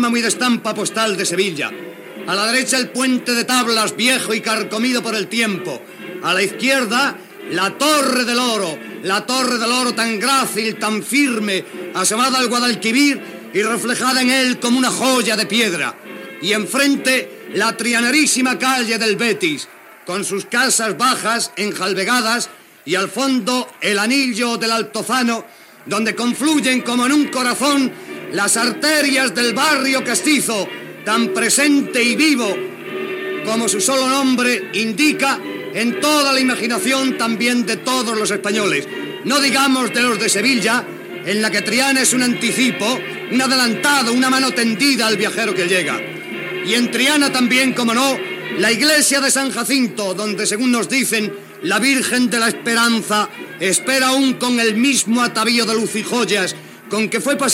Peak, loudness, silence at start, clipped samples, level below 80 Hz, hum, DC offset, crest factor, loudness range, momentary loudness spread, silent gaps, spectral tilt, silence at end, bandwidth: -2 dBFS; -16 LUFS; 0 s; under 0.1%; -82 dBFS; none; under 0.1%; 16 dB; 2 LU; 9 LU; none; -2 dB/octave; 0 s; 16.5 kHz